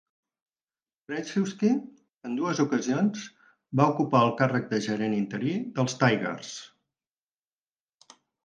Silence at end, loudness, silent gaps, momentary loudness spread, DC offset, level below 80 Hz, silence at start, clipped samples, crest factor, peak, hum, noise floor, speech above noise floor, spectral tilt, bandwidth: 1.8 s; -27 LUFS; 2.17-2.21 s; 14 LU; under 0.1%; -72 dBFS; 1.1 s; under 0.1%; 22 dB; -6 dBFS; none; under -90 dBFS; over 64 dB; -6 dB/octave; 9.4 kHz